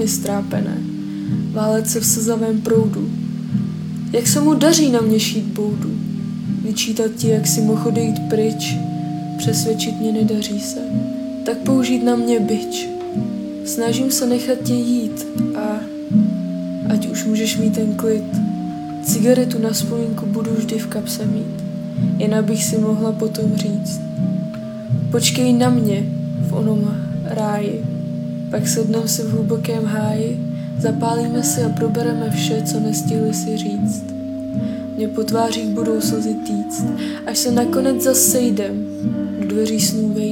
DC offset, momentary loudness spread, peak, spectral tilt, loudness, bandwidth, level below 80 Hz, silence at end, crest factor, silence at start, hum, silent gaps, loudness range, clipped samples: under 0.1%; 9 LU; 0 dBFS; -5 dB/octave; -19 LUFS; 17.5 kHz; -54 dBFS; 0 s; 18 dB; 0 s; none; none; 3 LU; under 0.1%